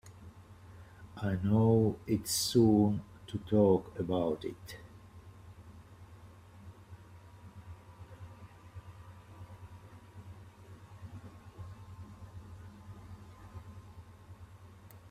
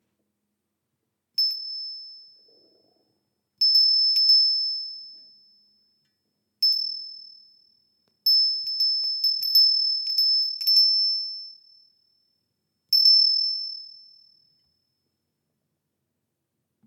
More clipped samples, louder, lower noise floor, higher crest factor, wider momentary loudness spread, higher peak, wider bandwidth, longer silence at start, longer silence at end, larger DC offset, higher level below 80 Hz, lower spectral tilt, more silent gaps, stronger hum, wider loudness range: neither; second, -30 LUFS vs -19 LUFS; second, -54 dBFS vs -80 dBFS; about the same, 22 dB vs 18 dB; first, 27 LU vs 18 LU; second, -14 dBFS vs -8 dBFS; about the same, 15.5 kHz vs 15.5 kHz; second, 0.05 s vs 1.4 s; second, 0 s vs 3 s; neither; first, -60 dBFS vs under -90 dBFS; first, -6 dB/octave vs 3.5 dB/octave; neither; neither; first, 24 LU vs 10 LU